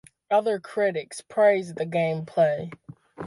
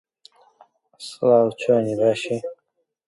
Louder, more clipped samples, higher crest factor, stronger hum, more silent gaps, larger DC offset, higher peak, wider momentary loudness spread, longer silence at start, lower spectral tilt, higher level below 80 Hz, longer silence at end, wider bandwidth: second, -25 LUFS vs -20 LUFS; neither; about the same, 16 dB vs 18 dB; neither; neither; neither; second, -10 dBFS vs -4 dBFS; second, 11 LU vs 19 LU; second, 0.3 s vs 1 s; about the same, -6 dB/octave vs -6 dB/octave; about the same, -70 dBFS vs -68 dBFS; second, 0 s vs 0.55 s; about the same, 11.5 kHz vs 11.5 kHz